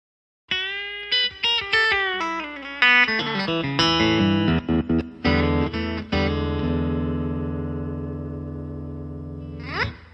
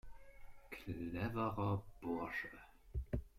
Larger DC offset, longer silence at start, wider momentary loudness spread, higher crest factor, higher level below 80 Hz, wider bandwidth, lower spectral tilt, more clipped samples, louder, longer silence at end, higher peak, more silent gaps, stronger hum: neither; first, 0.5 s vs 0.05 s; about the same, 15 LU vs 13 LU; about the same, 22 dB vs 18 dB; first, -42 dBFS vs -54 dBFS; second, 8.8 kHz vs 15.5 kHz; second, -5.5 dB/octave vs -8 dB/octave; neither; first, -22 LUFS vs -44 LUFS; about the same, 0.05 s vs 0.1 s; first, -2 dBFS vs -26 dBFS; neither; neither